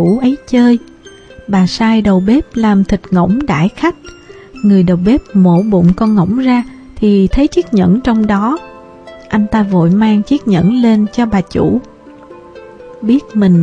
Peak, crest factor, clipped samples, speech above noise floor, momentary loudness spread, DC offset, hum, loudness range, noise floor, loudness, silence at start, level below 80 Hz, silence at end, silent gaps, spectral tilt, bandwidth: 0 dBFS; 10 dB; under 0.1%; 26 dB; 6 LU; under 0.1%; none; 2 LU; -36 dBFS; -12 LUFS; 0 s; -32 dBFS; 0 s; none; -8 dB/octave; 8.4 kHz